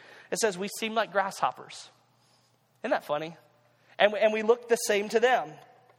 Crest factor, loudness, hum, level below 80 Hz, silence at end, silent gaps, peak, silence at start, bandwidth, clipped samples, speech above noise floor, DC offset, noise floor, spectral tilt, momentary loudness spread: 24 dB; -27 LUFS; none; -80 dBFS; 0.45 s; none; -6 dBFS; 0.15 s; 17 kHz; under 0.1%; 39 dB; under 0.1%; -66 dBFS; -2.5 dB/octave; 17 LU